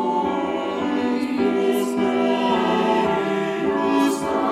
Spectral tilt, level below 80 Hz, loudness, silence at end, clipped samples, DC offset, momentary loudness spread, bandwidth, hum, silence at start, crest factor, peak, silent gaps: -5.5 dB/octave; -58 dBFS; -21 LUFS; 0 s; under 0.1%; under 0.1%; 4 LU; 15 kHz; none; 0 s; 14 dB; -8 dBFS; none